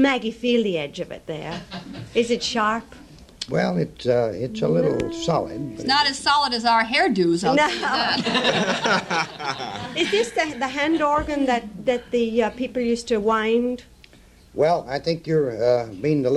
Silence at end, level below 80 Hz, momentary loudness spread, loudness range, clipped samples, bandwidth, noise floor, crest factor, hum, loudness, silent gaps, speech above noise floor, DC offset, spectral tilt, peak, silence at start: 0 s; -50 dBFS; 10 LU; 5 LU; under 0.1%; 12.5 kHz; -50 dBFS; 16 dB; none; -22 LUFS; none; 28 dB; under 0.1%; -4.5 dB/octave; -6 dBFS; 0 s